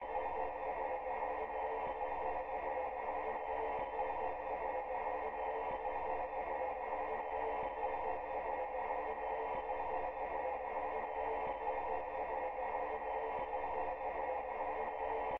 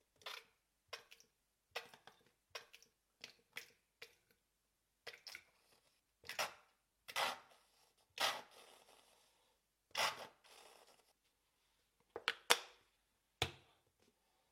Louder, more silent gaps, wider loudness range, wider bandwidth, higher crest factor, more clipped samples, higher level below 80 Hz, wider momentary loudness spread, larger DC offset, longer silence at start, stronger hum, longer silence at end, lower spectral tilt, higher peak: first, -40 LUFS vs -44 LUFS; neither; second, 0 LU vs 14 LU; second, 5.8 kHz vs 16 kHz; second, 12 dB vs 44 dB; neither; first, -60 dBFS vs -78 dBFS; second, 1 LU vs 24 LU; neither; second, 0 s vs 0.25 s; neither; second, 0 s vs 0.95 s; first, -3 dB/octave vs -0.5 dB/octave; second, -28 dBFS vs -6 dBFS